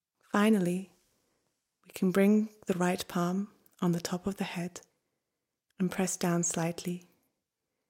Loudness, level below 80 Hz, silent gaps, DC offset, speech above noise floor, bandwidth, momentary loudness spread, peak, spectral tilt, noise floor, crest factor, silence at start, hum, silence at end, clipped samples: -31 LUFS; -70 dBFS; none; under 0.1%; 57 dB; 16.5 kHz; 14 LU; -14 dBFS; -5.5 dB/octave; -87 dBFS; 18 dB; 0.35 s; none; 0.9 s; under 0.1%